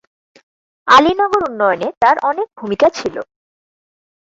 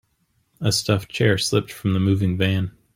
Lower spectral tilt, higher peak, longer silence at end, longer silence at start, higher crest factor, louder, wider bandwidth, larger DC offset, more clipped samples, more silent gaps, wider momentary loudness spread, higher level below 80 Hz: about the same, -4 dB/octave vs -5 dB/octave; first, 0 dBFS vs -4 dBFS; first, 1 s vs 0.25 s; first, 0.85 s vs 0.6 s; about the same, 16 dB vs 18 dB; first, -14 LUFS vs -21 LUFS; second, 8 kHz vs 16 kHz; neither; neither; first, 1.97-2.01 s vs none; first, 16 LU vs 4 LU; about the same, -52 dBFS vs -52 dBFS